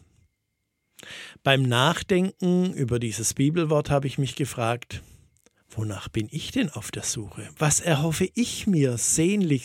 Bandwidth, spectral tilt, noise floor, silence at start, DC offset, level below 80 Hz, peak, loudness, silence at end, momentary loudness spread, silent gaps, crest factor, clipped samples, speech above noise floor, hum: 17 kHz; -4.5 dB/octave; -78 dBFS; 1.05 s; under 0.1%; -52 dBFS; -2 dBFS; -24 LUFS; 0 s; 11 LU; none; 22 dB; under 0.1%; 53 dB; none